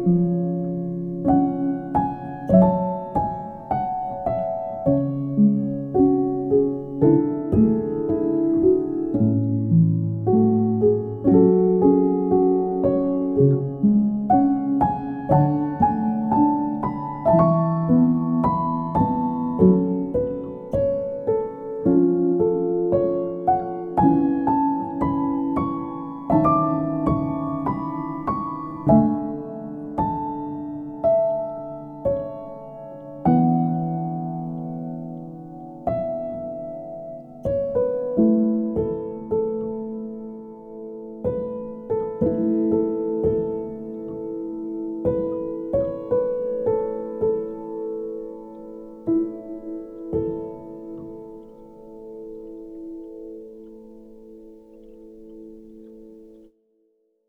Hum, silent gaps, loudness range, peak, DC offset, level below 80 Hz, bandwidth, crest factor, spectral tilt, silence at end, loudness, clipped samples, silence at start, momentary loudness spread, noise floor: none; none; 11 LU; -4 dBFS; under 0.1%; -48 dBFS; 3.6 kHz; 18 dB; -12.5 dB/octave; 0.95 s; -22 LUFS; under 0.1%; 0 s; 18 LU; -67 dBFS